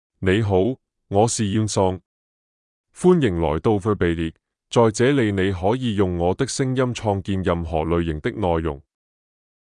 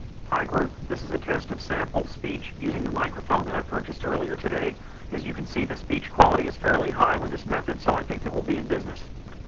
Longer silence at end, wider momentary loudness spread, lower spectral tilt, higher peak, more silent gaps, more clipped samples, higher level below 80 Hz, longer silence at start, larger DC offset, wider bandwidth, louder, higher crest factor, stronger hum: first, 0.95 s vs 0 s; second, 6 LU vs 11 LU; about the same, -6 dB/octave vs -6.5 dB/octave; second, -4 dBFS vs 0 dBFS; first, 2.06-2.84 s vs none; neither; about the same, -44 dBFS vs -40 dBFS; first, 0.2 s vs 0 s; neither; first, 11 kHz vs 7.8 kHz; first, -21 LUFS vs -27 LUFS; second, 18 dB vs 26 dB; neither